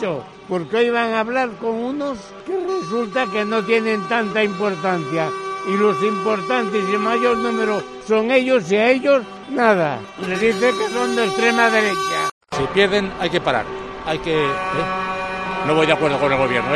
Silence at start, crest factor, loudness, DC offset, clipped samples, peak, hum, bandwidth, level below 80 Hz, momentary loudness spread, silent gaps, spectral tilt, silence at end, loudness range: 0 s; 20 dB; -19 LUFS; under 0.1%; under 0.1%; 0 dBFS; none; 13 kHz; -50 dBFS; 9 LU; 12.31-12.41 s; -5 dB/octave; 0 s; 3 LU